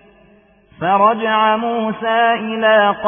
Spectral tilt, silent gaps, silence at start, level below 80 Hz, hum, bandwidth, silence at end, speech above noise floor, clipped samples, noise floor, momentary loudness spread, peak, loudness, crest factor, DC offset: -10 dB/octave; none; 0.8 s; -58 dBFS; none; 3.6 kHz; 0 s; 36 dB; under 0.1%; -50 dBFS; 7 LU; -2 dBFS; -15 LUFS; 14 dB; under 0.1%